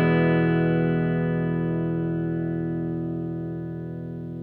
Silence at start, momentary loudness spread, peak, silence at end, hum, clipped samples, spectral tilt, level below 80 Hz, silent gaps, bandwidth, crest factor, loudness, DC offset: 0 s; 12 LU; -10 dBFS; 0 s; 50 Hz at -55 dBFS; under 0.1%; -11 dB/octave; -52 dBFS; none; 4.2 kHz; 14 dB; -25 LUFS; under 0.1%